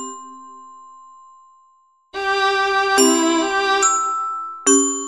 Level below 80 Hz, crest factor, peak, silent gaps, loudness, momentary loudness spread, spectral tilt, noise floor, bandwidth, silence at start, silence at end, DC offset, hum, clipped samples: -58 dBFS; 18 dB; -2 dBFS; none; -17 LUFS; 17 LU; 0 dB/octave; -57 dBFS; 14 kHz; 0 s; 0 s; under 0.1%; none; under 0.1%